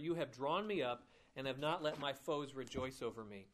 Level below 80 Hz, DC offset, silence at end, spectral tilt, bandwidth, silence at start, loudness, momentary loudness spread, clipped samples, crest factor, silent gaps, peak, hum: -72 dBFS; under 0.1%; 0.05 s; -5 dB/octave; 15 kHz; 0 s; -42 LUFS; 8 LU; under 0.1%; 18 dB; none; -26 dBFS; none